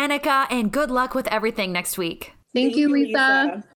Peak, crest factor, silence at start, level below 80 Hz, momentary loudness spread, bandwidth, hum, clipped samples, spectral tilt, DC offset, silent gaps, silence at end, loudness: -8 dBFS; 14 dB; 0 s; -50 dBFS; 9 LU; over 20 kHz; none; under 0.1%; -3.5 dB/octave; under 0.1%; none; 0.15 s; -21 LUFS